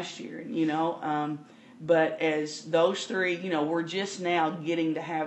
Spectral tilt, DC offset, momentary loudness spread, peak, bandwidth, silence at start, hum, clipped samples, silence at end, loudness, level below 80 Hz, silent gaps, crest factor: -5 dB/octave; under 0.1%; 10 LU; -10 dBFS; 8.6 kHz; 0 s; none; under 0.1%; 0 s; -28 LUFS; -82 dBFS; none; 20 dB